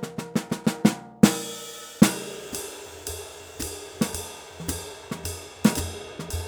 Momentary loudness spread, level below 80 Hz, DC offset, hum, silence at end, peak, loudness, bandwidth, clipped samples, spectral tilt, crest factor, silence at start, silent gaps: 15 LU; -48 dBFS; under 0.1%; none; 0 s; 0 dBFS; -27 LUFS; over 20 kHz; under 0.1%; -4.5 dB/octave; 26 dB; 0 s; none